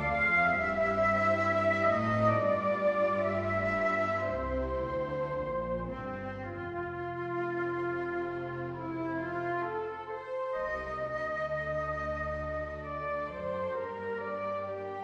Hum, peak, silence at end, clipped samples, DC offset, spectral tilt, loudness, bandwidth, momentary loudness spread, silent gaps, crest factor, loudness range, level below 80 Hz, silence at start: none; -14 dBFS; 0 s; under 0.1%; under 0.1%; -7.5 dB/octave; -32 LUFS; 9.2 kHz; 10 LU; none; 16 dB; 7 LU; -50 dBFS; 0 s